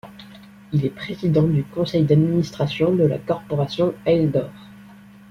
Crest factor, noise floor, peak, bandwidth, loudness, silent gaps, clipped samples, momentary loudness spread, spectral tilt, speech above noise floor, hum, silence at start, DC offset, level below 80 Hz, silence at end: 18 dB; -45 dBFS; -4 dBFS; 7 kHz; -21 LUFS; none; under 0.1%; 8 LU; -8.5 dB/octave; 25 dB; none; 0.05 s; under 0.1%; -50 dBFS; 0.5 s